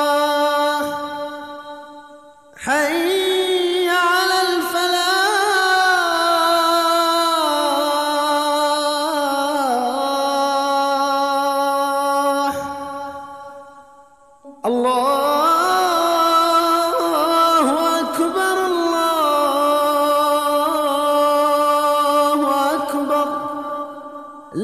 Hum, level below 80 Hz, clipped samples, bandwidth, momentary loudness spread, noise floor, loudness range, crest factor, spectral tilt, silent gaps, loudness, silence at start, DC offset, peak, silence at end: none; -62 dBFS; under 0.1%; 15.5 kHz; 12 LU; -48 dBFS; 5 LU; 14 dB; -2 dB/octave; none; -17 LUFS; 0 s; 0.1%; -4 dBFS; 0 s